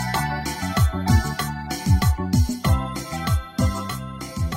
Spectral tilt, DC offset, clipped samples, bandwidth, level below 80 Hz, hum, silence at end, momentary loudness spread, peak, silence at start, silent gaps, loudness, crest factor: -5.5 dB/octave; under 0.1%; under 0.1%; 16.5 kHz; -28 dBFS; none; 0 s; 9 LU; -4 dBFS; 0 s; none; -23 LUFS; 18 dB